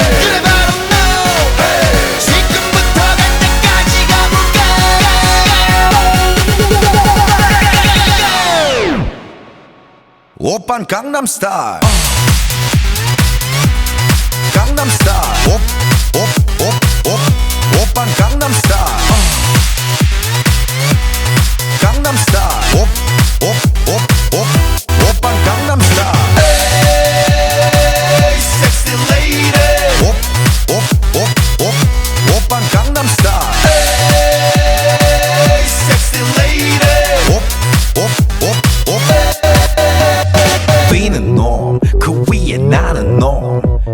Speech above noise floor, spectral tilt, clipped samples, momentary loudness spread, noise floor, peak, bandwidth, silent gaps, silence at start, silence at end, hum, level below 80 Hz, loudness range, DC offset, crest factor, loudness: 34 dB; -4 dB/octave; under 0.1%; 4 LU; -45 dBFS; 0 dBFS; over 20 kHz; none; 0 s; 0 s; none; -16 dBFS; 3 LU; under 0.1%; 10 dB; -10 LUFS